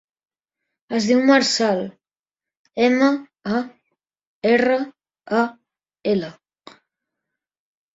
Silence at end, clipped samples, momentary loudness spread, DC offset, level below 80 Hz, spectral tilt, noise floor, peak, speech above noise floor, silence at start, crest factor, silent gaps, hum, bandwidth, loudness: 1.65 s; under 0.1%; 16 LU; under 0.1%; -66 dBFS; -4 dB/octave; under -90 dBFS; -2 dBFS; over 72 dB; 0.9 s; 20 dB; 2.57-2.65 s, 4.27-4.42 s; none; 7.8 kHz; -20 LUFS